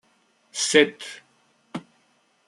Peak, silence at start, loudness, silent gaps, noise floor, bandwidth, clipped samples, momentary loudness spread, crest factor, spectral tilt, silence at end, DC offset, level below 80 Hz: -2 dBFS; 0.55 s; -20 LUFS; none; -65 dBFS; 12.5 kHz; under 0.1%; 20 LU; 24 dB; -2 dB/octave; 0.7 s; under 0.1%; -76 dBFS